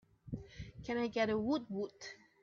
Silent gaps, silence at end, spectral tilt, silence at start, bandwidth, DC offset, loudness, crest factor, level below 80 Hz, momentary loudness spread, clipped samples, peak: none; 0.25 s; -6 dB/octave; 0.25 s; 7.4 kHz; under 0.1%; -39 LUFS; 18 dB; -62 dBFS; 17 LU; under 0.1%; -22 dBFS